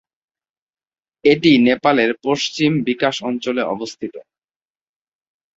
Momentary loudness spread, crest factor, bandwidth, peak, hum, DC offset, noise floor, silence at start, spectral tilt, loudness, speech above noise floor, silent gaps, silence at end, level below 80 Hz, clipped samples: 13 LU; 18 dB; 7.8 kHz; -2 dBFS; none; under 0.1%; under -90 dBFS; 1.25 s; -5 dB/octave; -17 LUFS; over 73 dB; none; 1.35 s; -60 dBFS; under 0.1%